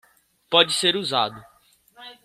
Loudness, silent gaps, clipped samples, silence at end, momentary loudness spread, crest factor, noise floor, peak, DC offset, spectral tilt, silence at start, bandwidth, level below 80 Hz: -20 LUFS; none; under 0.1%; 0.1 s; 7 LU; 22 dB; -54 dBFS; -2 dBFS; under 0.1%; -2 dB/octave; 0.5 s; 15.5 kHz; -66 dBFS